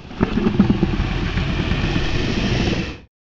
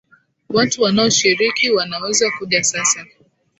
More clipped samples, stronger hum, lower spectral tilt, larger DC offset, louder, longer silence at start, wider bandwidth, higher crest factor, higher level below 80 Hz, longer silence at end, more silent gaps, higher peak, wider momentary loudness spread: neither; neither; first, -6.5 dB/octave vs -2 dB/octave; neither; second, -20 LUFS vs -16 LUFS; second, 0 s vs 0.5 s; about the same, 7.6 kHz vs 8.2 kHz; about the same, 18 dB vs 16 dB; first, -26 dBFS vs -56 dBFS; second, 0.25 s vs 0.55 s; neither; about the same, -2 dBFS vs -2 dBFS; about the same, 5 LU vs 5 LU